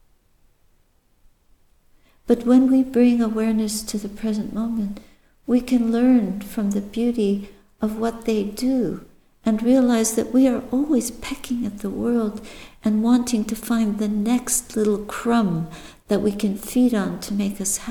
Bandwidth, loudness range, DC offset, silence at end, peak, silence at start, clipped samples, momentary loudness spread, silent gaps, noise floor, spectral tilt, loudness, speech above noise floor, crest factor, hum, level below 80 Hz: 19.5 kHz; 2 LU; under 0.1%; 0 s; -6 dBFS; 2.25 s; under 0.1%; 11 LU; none; -60 dBFS; -5 dB/octave; -21 LUFS; 40 dB; 16 dB; none; -48 dBFS